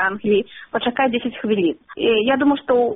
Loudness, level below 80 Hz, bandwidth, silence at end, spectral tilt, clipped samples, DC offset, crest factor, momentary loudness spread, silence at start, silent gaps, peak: -19 LUFS; -56 dBFS; 3.9 kHz; 0 s; -3 dB/octave; under 0.1%; under 0.1%; 14 dB; 6 LU; 0 s; none; -6 dBFS